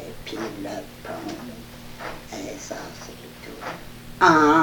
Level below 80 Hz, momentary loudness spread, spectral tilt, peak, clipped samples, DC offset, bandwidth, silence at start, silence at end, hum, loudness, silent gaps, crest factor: -48 dBFS; 22 LU; -4.5 dB/octave; -2 dBFS; under 0.1%; under 0.1%; 19 kHz; 0 s; 0 s; 60 Hz at -50 dBFS; -25 LUFS; none; 22 dB